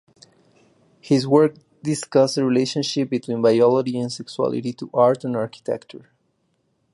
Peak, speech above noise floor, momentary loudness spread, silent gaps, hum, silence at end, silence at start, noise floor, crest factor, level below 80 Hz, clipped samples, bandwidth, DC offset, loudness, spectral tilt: -2 dBFS; 48 dB; 11 LU; none; none; 0.95 s; 1.05 s; -68 dBFS; 18 dB; -68 dBFS; under 0.1%; 11.5 kHz; under 0.1%; -21 LUFS; -6 dB/octave